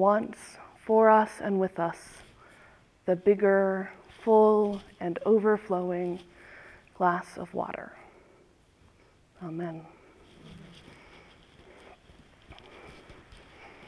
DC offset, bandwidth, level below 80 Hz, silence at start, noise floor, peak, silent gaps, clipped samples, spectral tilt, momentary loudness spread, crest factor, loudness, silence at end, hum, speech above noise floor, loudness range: under 0.1%; 11 kHz; -64 dBFS; 0 s; -61 dBFS; -8 dBFS; none; under 0.1%; -7.5 dB/octave; 27 LU; 20 dB; -27 LUFS; 0.2 s; none; 35 dB; 19 LU